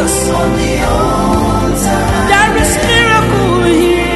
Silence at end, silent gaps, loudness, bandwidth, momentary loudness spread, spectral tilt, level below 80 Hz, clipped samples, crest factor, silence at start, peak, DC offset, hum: 0 s; none; -11 LUFS; 12.5 kHz; 4 LU; -4.5 dB/octave; -22 dBFS; under 0.1%; 10 dB; 0 s; 0 dBFS; under 0.1%; none